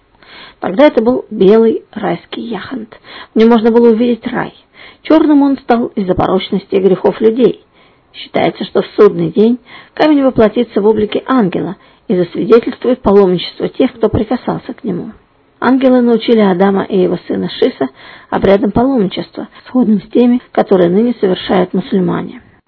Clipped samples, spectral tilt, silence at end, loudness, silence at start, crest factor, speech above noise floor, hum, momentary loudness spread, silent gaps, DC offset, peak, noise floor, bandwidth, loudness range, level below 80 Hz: 0.9%; -9 dB/octave; 0.3 s; -12 LUFS; 0.35 s; 12 dB; 26 dB; none; 13 LU; none; under 0.1%; 0 dBFS; -37 dBFS; 6 kHz; 2 LU; -42 dBFS